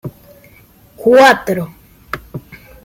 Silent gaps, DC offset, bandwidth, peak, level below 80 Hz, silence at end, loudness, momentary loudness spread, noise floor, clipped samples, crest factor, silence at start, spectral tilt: none; under 0.1%; 16.5 kHz; 0 dBFS; -48 dBFS; 0.3 s; -11 LUFS; 24 LU; -45 dBFS; under 0.1%; 16 dB; 0.05 s; -4.5 dB/octave